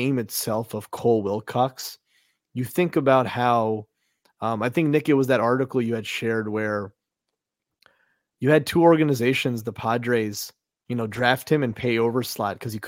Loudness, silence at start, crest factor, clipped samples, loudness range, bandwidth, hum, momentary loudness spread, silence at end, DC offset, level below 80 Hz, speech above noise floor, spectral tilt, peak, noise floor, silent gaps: -23 LUFS; 0 s; 20 dB; under 0.1%; 3 LU; 17 kHz; none; 11 LU; 0 s; under 0.1%; -62 dBFS; 61 dB; -5.5 dB/octave; -4 dBFS; -84 dBFS; none